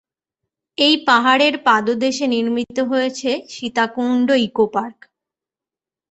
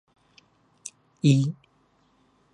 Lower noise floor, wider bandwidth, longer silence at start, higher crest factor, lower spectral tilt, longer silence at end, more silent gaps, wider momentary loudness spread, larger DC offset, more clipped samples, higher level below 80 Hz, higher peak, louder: first, -89 dBFS vs -65 dBFS; second, 8.2 kHz vs 11.5 kHz; about the same, 0.8 s vs 0.85 s; about the same, 18 dB vs 20 dB; second, -3.5 dB/octave vs -6.5 dB/octave; first, 1.2 s vs 1 s; neither; second, 10 LU vs 21 LU; neither; neither; first, -64 dBFS vs -72 dBFS; first, -2 dBFS vs -8 dBFS; first, -17 LUFS vs -23 LUFS